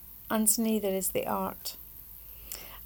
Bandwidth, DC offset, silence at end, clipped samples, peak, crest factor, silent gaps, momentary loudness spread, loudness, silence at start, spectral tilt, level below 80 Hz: over 20 kHz; under 0.1%; 0 s; under 0.1%; -10 dBFS; 22 dB; none; 20 LU; -29 LUFS; 0 s; -3.5 dB/octave; -56 dBFS